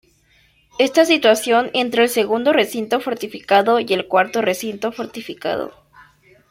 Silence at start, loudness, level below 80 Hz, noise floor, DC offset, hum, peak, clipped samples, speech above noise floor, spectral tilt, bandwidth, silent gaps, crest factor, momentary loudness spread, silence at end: 0.8 s; -18 LUFS; -62 dBFS; -57 dBFS; under 0.1%; none; 0 dBFS; under 0.1%; 39 dB; -3 dB/octave; 16.5 kHz; none; 18 dB; 13 LU; 0.8 s